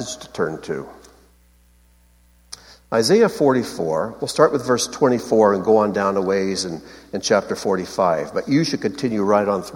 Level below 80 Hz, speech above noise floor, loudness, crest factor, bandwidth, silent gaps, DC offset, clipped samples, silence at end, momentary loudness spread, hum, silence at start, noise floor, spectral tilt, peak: -56 dBFS; 35 dB; -19 LUFS; 18 dB; 16.5 kHz; none; under 0.1%; under 0.1%; 0 s; 14 LU; 60 Hz at -50 dBFS; 0 s; -54 dBFS; -4.5 dB/octave; -2 dBFS